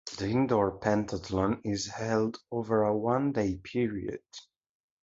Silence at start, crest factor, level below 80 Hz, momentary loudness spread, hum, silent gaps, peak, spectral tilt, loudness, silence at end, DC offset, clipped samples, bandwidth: 0.05 s; 18 dB; -54 dBFS; 10 LU; none; none; -12 dBFS; -6 dB/octave; -30 LUFS; 0.6 s; under 0.1%; under 0.1%; 7.8 kHz